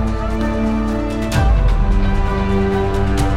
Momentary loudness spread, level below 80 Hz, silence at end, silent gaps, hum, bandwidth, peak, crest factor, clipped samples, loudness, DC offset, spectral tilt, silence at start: 4 LU; -18 dBFS; 0 s; none; none; 13 kHz; -2 dBFS; 12 dB; under 0.1%; -18 LUFS; under 0.1%; -7 dB/octave; 0 s